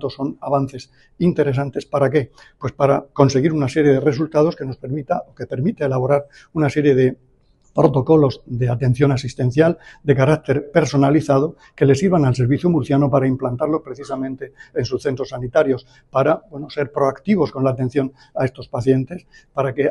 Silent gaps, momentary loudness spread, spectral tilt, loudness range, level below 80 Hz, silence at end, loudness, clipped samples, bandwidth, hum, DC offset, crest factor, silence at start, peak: none; 11 LU; -7.5 dB/octave; 4 LU; -48 dBFS; 0 s; -19 LUFS; under 0.1%; 11 kHz; none; under 0.1%; 18 dB; 0 s; 0 dBFS